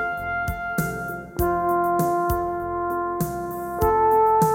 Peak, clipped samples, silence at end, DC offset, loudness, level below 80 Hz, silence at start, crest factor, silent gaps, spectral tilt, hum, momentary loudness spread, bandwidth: -6 dBFS; under 0.1%; 0 s; under 0.1%; -23 LUFS; -40 dBFS; 0 s; 16 dB; none; -6.5 dB/octave; none; 10 LU; 17 kHz